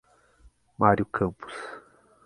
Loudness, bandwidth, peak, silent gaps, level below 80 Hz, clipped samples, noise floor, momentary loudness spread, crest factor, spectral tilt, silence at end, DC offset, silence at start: -25 LUFS; 11.5 kHz; -4 dBFS; none; -54 dBFS; under 0.1%; -59 dBFS; 19 LU; 26 dB; -8 dB/octave; 0.45 s; under 0.1%; 0.8 s